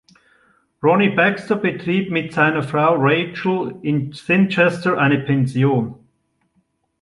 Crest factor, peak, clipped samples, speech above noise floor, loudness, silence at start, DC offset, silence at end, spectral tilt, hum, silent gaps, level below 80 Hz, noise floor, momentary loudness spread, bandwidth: 16 dB; -2 dBFS; under 0.1%; 48 dB; -18 LUFS; 0.8 s; under 0.1%; 1.05 s; -7.5 dB/octave; none; none; -60 dBFS; -66 dBFS; 7 LU; 11.5 kHz